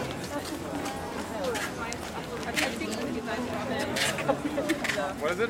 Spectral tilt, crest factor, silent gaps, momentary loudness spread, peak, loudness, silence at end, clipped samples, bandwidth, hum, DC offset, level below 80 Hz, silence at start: -3.5 dB/octave; 20 dB; none; 7 LU; -10 dBFS; -31 LUFS; 0 s; under 0.1%; 16.5 kHz; none; under 0.1%; -54 dBFS; 0 s